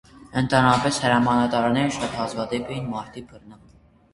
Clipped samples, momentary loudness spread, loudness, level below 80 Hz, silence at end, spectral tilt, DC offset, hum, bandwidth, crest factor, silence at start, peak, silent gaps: under 0.1%; 12 LU; -22 LUFS; -50 dBFS; 0.6 s; -5 dB/octave; under 0.1%; none; 11.5 kHz; 20 dB; 0.15 s; -2 dBFS; none